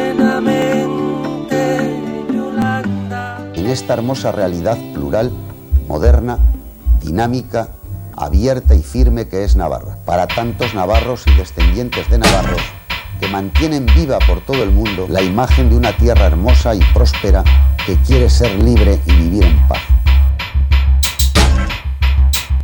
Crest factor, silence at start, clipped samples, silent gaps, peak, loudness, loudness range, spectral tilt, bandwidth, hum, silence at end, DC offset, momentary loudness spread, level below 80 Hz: 12 dB; 0 s; under 0.1%; none; 0 dBFS; -14 LUFS; 6 LU; -6 dB/octave; 18 kHz; none; 0 s; under 0.1%; 9 LU; -14 dBFS